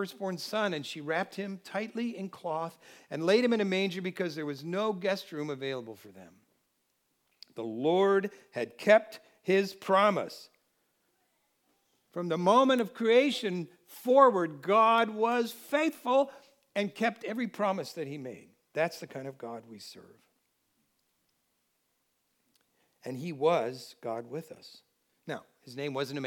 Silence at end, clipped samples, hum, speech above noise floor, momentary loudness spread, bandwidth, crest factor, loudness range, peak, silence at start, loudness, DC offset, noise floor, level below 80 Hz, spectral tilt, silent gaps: 0 s; under 0.1%; none; 47 dB; 18 LU; 19 kHz; 22 dB; 11 LU; -8 dBFS; 0 s; -30 LUFS; under 0.1%; -77 dBFS; under -90 dBFS; -5.5 dB/octave; none